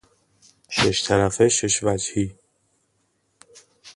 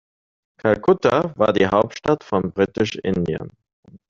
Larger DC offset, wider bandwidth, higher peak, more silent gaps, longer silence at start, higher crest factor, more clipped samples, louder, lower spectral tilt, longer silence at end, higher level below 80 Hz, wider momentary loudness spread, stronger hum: neither; first, 11.5 kHz vs 7.4 kHz; second, -4 dBFS vs 0 dBFS; second, none vs 3.73-3.83 s; about the same, 0.7 s vs 0.65 s; about the same, 20 dB vs 20 dB; neither; about the same, -21 LUFS vs -20 LUFS; second, -3.5 dB/octave vs -6.5 dB/octave; about the same, 0.05 s vs 0.15 s; about the same, -48 dBFS vs -52 dBFS; about the same, 9 LU vs 8 LU; neither